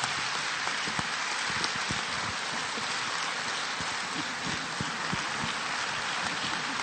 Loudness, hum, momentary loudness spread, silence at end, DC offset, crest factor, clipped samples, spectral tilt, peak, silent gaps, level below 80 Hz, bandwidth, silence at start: -30 LUFS; none; 3 LU; 0 s; under 0.1%; 22 dB; under 0.1%; -1.5 dB/octave; -10 dBFS; none; -60 dBFS; 16 kHz; 0 s